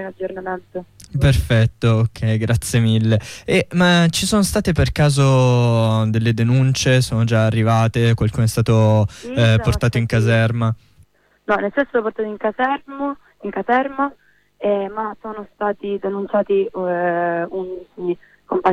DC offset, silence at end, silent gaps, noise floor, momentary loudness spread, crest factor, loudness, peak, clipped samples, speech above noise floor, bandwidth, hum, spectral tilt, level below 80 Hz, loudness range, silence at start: under 0.1%; 0 s; none; -54 dBFS; 12 LU; 12 dB; -18 LUFS; -4 dBFS; under 0.1%; 36 dB; 15 kHz; none; -6 dB/octave; -36 dBFS; 6 LU; 0 s